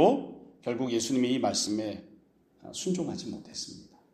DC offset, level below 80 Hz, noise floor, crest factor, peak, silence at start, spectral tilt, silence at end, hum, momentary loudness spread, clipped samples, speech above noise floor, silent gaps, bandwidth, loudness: under 0.1%; -68 dBFS; -61 dBFS; 22 dB; -8 dBFS; 0 s; -4.5 dB/octave; 0.3 s; none; 15 LU; under 0.1%; 32 dB; none; 15.5 kHz; -31 LUFS